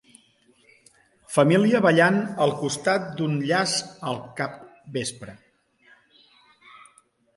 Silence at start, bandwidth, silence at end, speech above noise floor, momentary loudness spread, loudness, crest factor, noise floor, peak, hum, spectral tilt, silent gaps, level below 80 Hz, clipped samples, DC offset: 1.3 s; 11.5 kHz; 2.05 s; 38 dB; 14 LU; -23 LUFS; 20 dB; -61 dBFS; -4 dBFS; none; -5 dB/octave; none; -66 dBFS; under 0.1%; under 0.1%